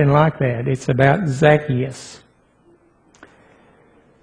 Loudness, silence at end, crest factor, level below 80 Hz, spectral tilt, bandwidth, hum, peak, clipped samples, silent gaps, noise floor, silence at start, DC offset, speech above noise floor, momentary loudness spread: -17 LUFS; 2.05 s; 20 dB; -48 dBFS; -7 dB/octave; 10 kHz; none; 0 dBFS; under 0.1%; none; -55 dBFS; 0 s; under 0.1%; 38 dB; 13 LU